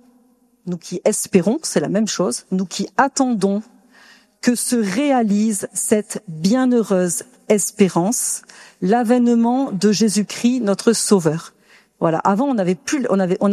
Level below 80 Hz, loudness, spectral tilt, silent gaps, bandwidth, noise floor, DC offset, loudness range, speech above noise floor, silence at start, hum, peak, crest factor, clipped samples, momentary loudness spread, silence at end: -66 dBFS; -18 LUFS; -4.5 dB/octave; none; 14 kHz; -57 dBFS; under 0.1%; 3 LU; 39 dB; 0.65 s; none; 0 dBFS; 18 dB; under 0.1%; 7 LU; 0 s